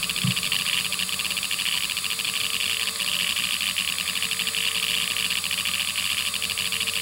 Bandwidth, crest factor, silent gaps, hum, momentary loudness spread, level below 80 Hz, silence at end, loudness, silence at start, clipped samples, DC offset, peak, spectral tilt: 17 kHz; 18 dB; none; none; 2 LU; -60 dBFS; 0 s; -23 LUFS; 0 s; under 0.1%; under 0.1%; -8 dBFS; 0 dB/octave